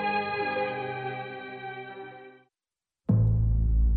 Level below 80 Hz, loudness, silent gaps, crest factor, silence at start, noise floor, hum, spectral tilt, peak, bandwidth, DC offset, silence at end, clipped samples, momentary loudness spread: -32 dBFS; -29 LUFS; none; 14 dB; 0 s; under -90 dBFS; none; -10.5 dB/octave; -14 dBFS; 4.5 kHz; under 0.1%; 0 s; under 0.1%; 17 LU